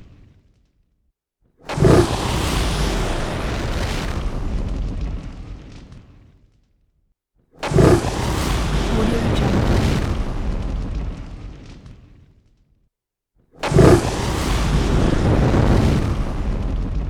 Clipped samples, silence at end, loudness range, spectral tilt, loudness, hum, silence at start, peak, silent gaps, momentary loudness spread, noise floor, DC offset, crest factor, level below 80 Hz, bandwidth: under 0.1%; 0 s; 13 LU; -6 dB/octave; -20 LUFS; none; 0 s; 0 dBFS; none; 18 LU; -74 dBFS; under 0.1%; 20 dB; -26 dBFS; 17 kHz